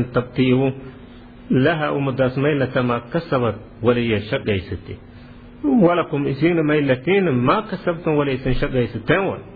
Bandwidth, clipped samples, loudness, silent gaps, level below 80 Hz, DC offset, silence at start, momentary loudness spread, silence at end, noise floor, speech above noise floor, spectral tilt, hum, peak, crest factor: 4.9 kHz; under 0.1%; -19 LUFS; none; -38 dBFS; under 0.1%; 0 s; 8 LU; 0 s; -40 dBFS; 21 dB; -10.5 dB/octave; none; -4 dBFS; 16 dB